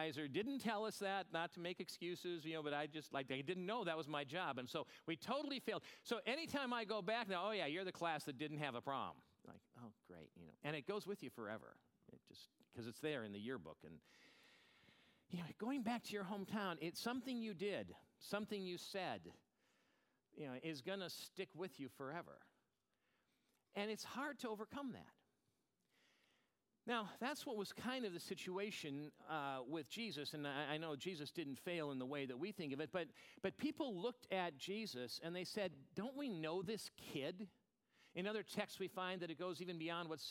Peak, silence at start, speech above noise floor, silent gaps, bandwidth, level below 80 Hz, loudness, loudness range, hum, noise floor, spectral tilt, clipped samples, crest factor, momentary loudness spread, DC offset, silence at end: -26 dBFS; 0 s; 40 dB; none; 17 kHz; -88 dBFS; -47 LUFS; 7 LU; none; -87 dBFS; -4.5 dB/octave; under 0.1%; 22 dB; 11 LU; under 0.1%; 0 s